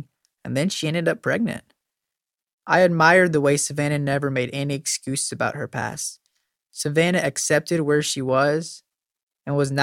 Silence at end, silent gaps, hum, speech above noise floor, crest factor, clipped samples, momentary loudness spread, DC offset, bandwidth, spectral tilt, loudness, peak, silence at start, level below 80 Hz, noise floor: 0 s; 2.53-2.58 s, 9.23-9.27 s; none; 66 dB; 20 dB; under 0.1%; 12 LU; under 0.1%; 16.5 kHz; -4.5 dB/octave; -21 LUFS; -2 dBFS; 0 s; -62 dBFS; -87 dBFS